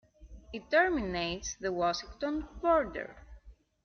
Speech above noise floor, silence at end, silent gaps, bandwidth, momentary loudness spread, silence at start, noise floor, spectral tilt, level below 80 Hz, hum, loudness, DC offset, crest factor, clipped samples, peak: 25 dB; 0.3 s; none; 7 kHz; 15 LU; 0.2 s; -56 dBFS; -4 dB/octave; -52 dBFS; none; -31 LUFS; under 0.1%; 20 dB; under 0.1%; -14 dBFS